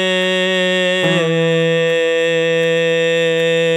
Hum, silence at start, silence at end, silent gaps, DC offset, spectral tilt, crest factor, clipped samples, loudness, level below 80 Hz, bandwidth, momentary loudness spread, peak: none; 0 s; 0 s; none; under 0.1%; -4.5 dB/octave; 10 dB; under 0.1%; -15 LUFS; -72 dBFS; 12 kHz; 1 LU; -4 dBFS